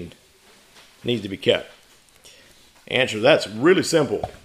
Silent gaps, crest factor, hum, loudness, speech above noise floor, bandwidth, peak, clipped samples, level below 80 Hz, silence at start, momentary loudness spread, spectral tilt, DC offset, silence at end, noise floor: none; 20 dB; none; -20 LUFS; 33 dB; 15.5 kHz; -2 dBFS; under 0.1%; -56 dBFS; 0 s; 9 LU; -4.5 dB/octave; under 0.1%; 0.1 s; -53 dBFS